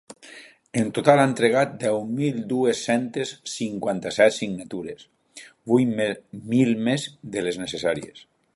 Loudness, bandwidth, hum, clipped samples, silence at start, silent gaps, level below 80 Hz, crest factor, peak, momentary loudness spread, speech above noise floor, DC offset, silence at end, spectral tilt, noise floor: -23 LUFS; 11.5 kHz; none; under 0.1%; 0.1 s; none; -64 dBFS; 22 dB; 0 dBFS; 15 LU; 25 dB; under 0.1%; 0.35 s; -5.5 dB/octave; -48 dBFS